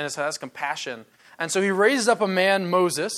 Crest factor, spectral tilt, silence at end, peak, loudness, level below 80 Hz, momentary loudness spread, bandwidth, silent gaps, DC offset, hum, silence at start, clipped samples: 18 dB; -3.5 dB/octave; 0 s; -6 dBFS; -22 LUFS; -76 dBFS; 12 LU; 14 kHz; none; under 0.1%; none; 0 s; under 0.1%